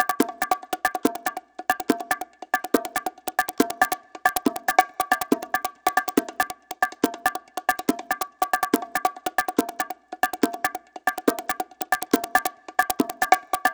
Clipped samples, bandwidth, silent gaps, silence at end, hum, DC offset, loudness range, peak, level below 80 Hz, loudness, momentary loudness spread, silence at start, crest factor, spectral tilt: under 0.1%; over 20 kHz; none; 0 s; none; under 0.1%; 2 LU; 0 dBFS; -62 dBFS; -25 LUFS; 7 LU; 0 s; 26 dB; -2.5 dB/octave